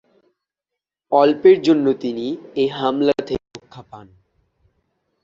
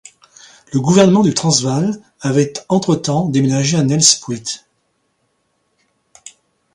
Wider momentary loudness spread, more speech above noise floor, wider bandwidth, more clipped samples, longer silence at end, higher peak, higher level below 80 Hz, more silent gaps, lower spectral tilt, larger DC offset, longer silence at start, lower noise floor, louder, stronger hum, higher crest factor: about the same, 15 LU vs 13 LU; first, 67 dB vs 51 dB; second, 7.6 kHz vs 11.5 kHz; neither; second, 1.2 s vs 2.15 s; about the same, -2 dBFS vs 0 dBFS; about the same, -56 dBFS vs -54 dBFS; neither; first, -6.5 dB/octave vs -4.5 dB/octave; neither; first, 1.1 s vs 0.7 s; first, -84 dBFS vs -66 dBFS; second, -18 LUFS vs -14 LUFS; neither; about the same, 18 dB vs 16 dB